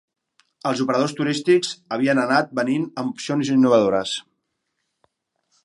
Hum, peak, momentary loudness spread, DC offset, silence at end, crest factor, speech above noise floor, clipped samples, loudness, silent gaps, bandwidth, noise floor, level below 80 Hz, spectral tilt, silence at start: none; -4 dBFS; 11 LU; under 0.1%; 1.45 s; 18 dB; 56 dB; under 0.1%; -21 LUFS; none; 11.5 kHz; -76 dBFS; -68 dBFS; -5 dB/octave; 0.65 s